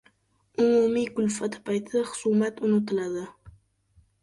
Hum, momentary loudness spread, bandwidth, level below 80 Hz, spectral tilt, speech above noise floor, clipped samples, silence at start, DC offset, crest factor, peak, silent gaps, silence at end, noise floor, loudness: none; 11 LU; 11.5 kHz; -64 dBFS; -5.5 dB/octave; 41 dB; under 0.1%; 0.6 s; under 0.1%; 16 dB; -12 dBFS; none; 0.7 s; -66 dBFS; -26 LUFS